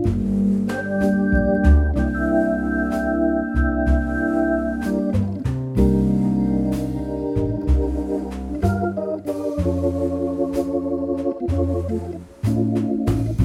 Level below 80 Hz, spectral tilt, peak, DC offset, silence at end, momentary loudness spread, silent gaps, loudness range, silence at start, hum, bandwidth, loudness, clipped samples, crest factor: -26 dBFS; -9 dB/octave; -4 dBFS; under 0.1%; 0 s; 7 LU; none; 4 LU; 0 s; none; 13.5 kHz; -21 LUFS; under 0.1%; 16 dB